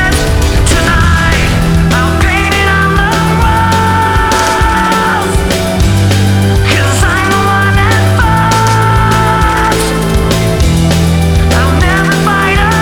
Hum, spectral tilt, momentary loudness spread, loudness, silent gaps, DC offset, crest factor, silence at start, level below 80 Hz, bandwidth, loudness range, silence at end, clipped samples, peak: none; -5 dB/octave; 2 LU; -9 LUFS; none; under 0.1%; 8 dB; 0 s; -16 dBFS; over 20 kHz; 1 LU; 0 s; under 0.1%; 0 dBFS